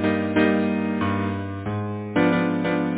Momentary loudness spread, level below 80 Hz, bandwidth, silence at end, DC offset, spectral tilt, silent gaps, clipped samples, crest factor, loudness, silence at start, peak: 8 LU; -48 dBFS; 4 kHz; 0 s; under 0.1%; -11 dB/octave; none; under 0.1%; 16 dB; -23 LUFS; 0 s; -8 dBFS